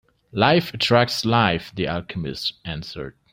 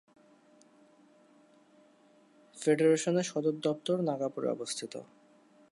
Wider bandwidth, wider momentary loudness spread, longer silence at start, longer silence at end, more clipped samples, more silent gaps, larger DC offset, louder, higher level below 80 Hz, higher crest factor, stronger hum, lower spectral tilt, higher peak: first, 16 kHz vs 11.5 kHz; about the same, 14 LU vs 12 LU; second, 0.35 s vs 2.55 s; second, 0.25 s vs 0.65 s; neither; neither; neither; first, -21 LUFS vs -31 LUFS; first, -50 dBFS vs -86 dBFS; about the same, 20 dB vs 20 dB; neither; about the same, -5.5 dB/octave vs -5 dB/octave; first, -2 dBFS vs -14 dBFS